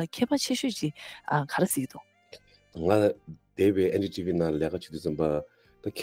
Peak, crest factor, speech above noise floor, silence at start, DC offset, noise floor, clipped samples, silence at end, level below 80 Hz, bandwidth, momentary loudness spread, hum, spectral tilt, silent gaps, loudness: -10 dBFS; 20 dB; 26 dB; 0 s; under 0.1%; -54 dBFS; under 0.1%; 0 s; -60 dBFS; 16.5 kHz; 15 LU; none; -5 dB/octave; none; -28 LUFS